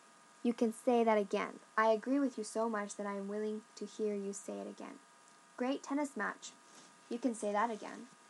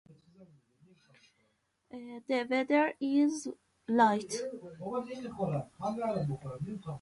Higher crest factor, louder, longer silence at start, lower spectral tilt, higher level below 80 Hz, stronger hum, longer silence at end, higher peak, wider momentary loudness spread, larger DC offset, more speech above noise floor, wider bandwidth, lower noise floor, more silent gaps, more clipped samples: about the same, 20 dB vs 22 dB; second, -37 LUFS vs -32 LUFS; first, 0.45 s vs 0.1 s; second, -4.5 dB/octave vs -6 dB/octave; second, under -90 dBFS vs -70 dBFS; neither; about the same, 0.15 s vs 0.05 s; second, -18 dBFS vs -12 dBFS; about the same, 17 LU vs 17 LU; neither; second, 26 dB vs 43 dB; about the same, 12 kHz vs 11.5 kHz; second, -62 dBFS vs -75 dBFS; neither; neither